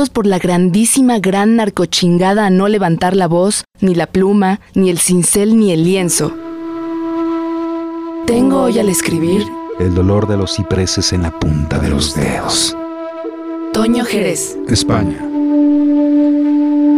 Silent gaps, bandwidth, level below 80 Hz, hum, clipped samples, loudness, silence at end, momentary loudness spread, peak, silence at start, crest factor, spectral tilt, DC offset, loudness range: none; 16 kHz; -36 dBFS; none; under 0.1%; -13 LUFS; 0 s; 9 LU; -2 dBFS; 0 s; 10 dB; -5 dB/octave; 0.3%; 4 LU